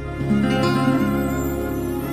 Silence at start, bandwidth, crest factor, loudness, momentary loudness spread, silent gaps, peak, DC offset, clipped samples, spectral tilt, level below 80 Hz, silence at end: 0 s; 15.5 kHz; 14 dB; -21 LUFS; 6 LU; none; -6 dBFS; under 0.1%; under 0.1%; -6.5 dB/octave; -36 dBFS; 0 s